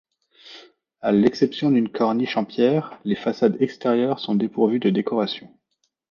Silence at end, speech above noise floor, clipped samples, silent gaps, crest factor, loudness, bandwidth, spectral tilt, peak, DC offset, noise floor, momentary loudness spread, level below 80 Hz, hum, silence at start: 0.65 s; 52 dB; under 0.1%; none; 18 dB; -21 LUFS; 7 kHz; -7.5 dB/octave; -4 dBFS; under 0.1%; -73 dBFS; 6 LU; -64 dBFS; none; 0.45 s